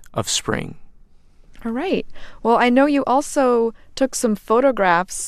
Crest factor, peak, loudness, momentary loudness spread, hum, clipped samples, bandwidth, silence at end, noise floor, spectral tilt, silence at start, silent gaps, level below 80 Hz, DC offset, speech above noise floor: 18 dB; -2 dBFS; -19 LUFS; 11 LU; none; under 0.1%; 15 kHz; 0 s; -47 dBFS; -4 dB/octave; 0 s; none; -44 dBFS; under 0.1%; 28 dB